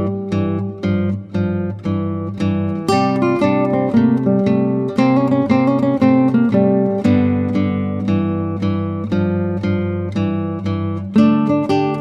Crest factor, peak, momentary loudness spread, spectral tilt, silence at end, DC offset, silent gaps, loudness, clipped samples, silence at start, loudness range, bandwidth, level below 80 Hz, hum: 14 dB; -2 dBFS; 7 LU; -8.5 dB/octave; 0 s; under 0.1%; none; -17 LUFS; under 0.1%; 0 s; 5 LU; 9.8 kHz; -52 dBFS; none